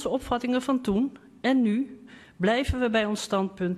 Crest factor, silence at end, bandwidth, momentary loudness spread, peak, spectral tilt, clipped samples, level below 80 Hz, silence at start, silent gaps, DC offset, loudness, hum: 14 dB; 0 s; 13 kHz; 6 LU; -12 dBFS; -5.5 dB/octave; under 0.1%; -44 dBFS; 0 s; none; under 0.1%; -26 LUFS; none